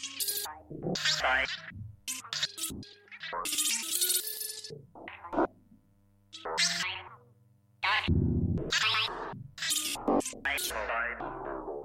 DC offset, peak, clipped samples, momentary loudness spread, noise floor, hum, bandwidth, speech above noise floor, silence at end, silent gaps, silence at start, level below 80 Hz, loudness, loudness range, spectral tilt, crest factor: under 0.1%; -16 dBFS; under 0.1%; 16 LU; -65 dBFS; none; 16.5 kHz; 33 dB; 0 s; none; 0 s; -50 dBFS; -31 LUFS; 3 LU; -2.5 dB/octave; 18 dB